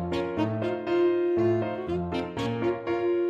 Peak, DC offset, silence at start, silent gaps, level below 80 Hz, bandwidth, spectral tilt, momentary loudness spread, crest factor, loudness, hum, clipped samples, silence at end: -16 dBFS; under 0.1%; 0 s; none; -54 dBFS; 7.6 kHz; -8 dB/octave; 6 LU; 12 dB; -27 LUFS; none; under 0.1%; 0 s